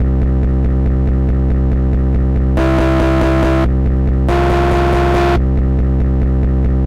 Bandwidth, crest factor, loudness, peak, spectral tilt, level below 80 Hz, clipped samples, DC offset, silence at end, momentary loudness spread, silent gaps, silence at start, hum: 7 kHz; 4 dB; -14 LUFS; -8 dBFS; -8.5 dB/octave; -14 dBFS; under 0.1%; 0.5%; 0 s; 2 LU; none; 0 s; none